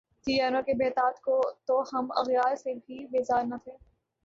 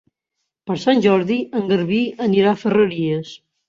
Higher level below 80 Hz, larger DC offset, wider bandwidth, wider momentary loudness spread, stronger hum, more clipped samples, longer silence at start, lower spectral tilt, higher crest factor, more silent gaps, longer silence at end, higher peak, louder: about the same, -62 dBFS vs -60 dBFS; neither; about the same, 7.6 kHz vs 7.4 kHz; about the same, 9 LU vs 11 LU; neither; neither; second, 0.25 s vs 0.65 s; second, -4.5 dB/octave vs -7 dB/octave; about the same, 16 dB vs 16 dB; neither; first, 0.5 s vs 0.35 s; second, -12 dBFS vs -2 dBFS; second, -28 LUFS vs -18 LUFS